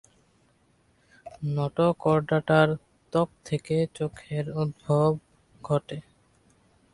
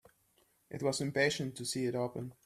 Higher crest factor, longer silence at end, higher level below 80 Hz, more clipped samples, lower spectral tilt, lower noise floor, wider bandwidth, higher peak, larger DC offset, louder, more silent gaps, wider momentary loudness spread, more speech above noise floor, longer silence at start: about the same, 22 dB vs 20 dB; first, 0.9 s vs 0.15 s; first, -60 dBFS vs -72 dBFS; neither; first, -7.5 dB/octave vs -4 dB/octave; second, -65 dBFS vs -72 dBFS; second, 11 kHz vs 15 kHz; first, -6 dBFS vs -16 dBFS; neither; first, -27 LUFS vs -35 LUFS; neither; first, 13 LU vs 7 LU; about the same, 40 dB vs 37 dB; first, 1.25 s vs 0.7 s